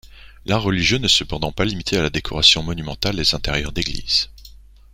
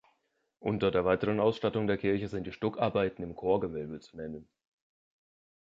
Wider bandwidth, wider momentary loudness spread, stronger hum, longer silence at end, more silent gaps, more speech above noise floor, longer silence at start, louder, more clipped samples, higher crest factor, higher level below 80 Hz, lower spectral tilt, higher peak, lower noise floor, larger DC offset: first, 16.5 kHz vs 7.6 kHz; second, 11 LU vs 14 LU; neither; second, 0.4 s vs 1.15 s; neither; second, 24 dB vs 46 dB; second, 0.05 s vs 0.6 s; first, -18 LUFS vs -31 LUFS; neither; about the same, 20 dB vs 18 dB; first, -36 dBFS vs -58 dBFS; second, -3.5 dB/octave vs -8 dB/octave; first, 0 dBFS vs -14 dBFS; second, -44 dBFS vs -77 dBFS; neither